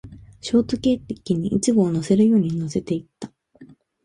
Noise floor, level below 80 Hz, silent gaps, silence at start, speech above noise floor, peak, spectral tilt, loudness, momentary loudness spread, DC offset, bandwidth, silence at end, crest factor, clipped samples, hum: -49 dBFS; -50 dBFS; none; 0.05 s; 29 dB; -6 dBFS; -6.5 dB/octave; -21 LUFS; 17 LU; under 0.1%; 11.5 kHz; 0.4 s; 16 dB; under 0.1%; none